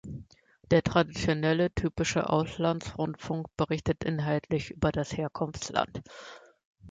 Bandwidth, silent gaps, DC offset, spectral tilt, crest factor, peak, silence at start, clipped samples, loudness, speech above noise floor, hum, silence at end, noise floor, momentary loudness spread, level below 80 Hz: 9.2 kHz; 6.65-6.73 s; under 0.1%; -6 dB/octave; 22 dB; -8 dBFS; 0.05 s; under 0.1%; -29 LUFS; 26 dB; none; 0 s; -55 dBFS; 10 LU; -50 dBFS